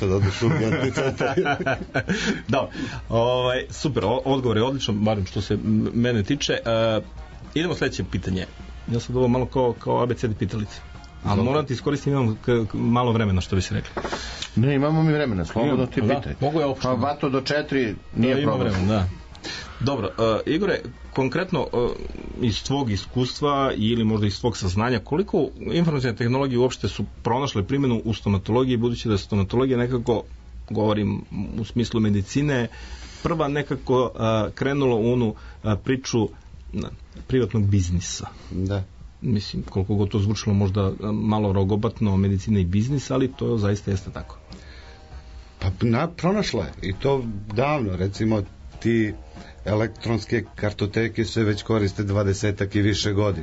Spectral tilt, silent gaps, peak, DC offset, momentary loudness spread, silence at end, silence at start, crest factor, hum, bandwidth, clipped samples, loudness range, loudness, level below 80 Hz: -6.5 dB/octave; none; -10 dBFS; under 0.1%; 9 LU; 0 s; 0 s; 12 dB; none; 8 kHz; under 0.1%; 3 LU; -24 LUFS; -42 dBFS